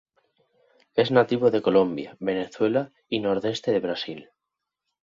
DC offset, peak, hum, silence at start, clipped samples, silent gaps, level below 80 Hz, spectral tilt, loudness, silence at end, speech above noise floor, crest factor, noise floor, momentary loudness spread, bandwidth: under 0.1%; -6 dBFS; none; 0.95 s; under 0.1%; none; -64 dBFS; -6.5 dB/octave; -24 LUFS; 0.8 s; 61 dB; 20 dB; -85 dBFS; 10 LU; 7.4 kHz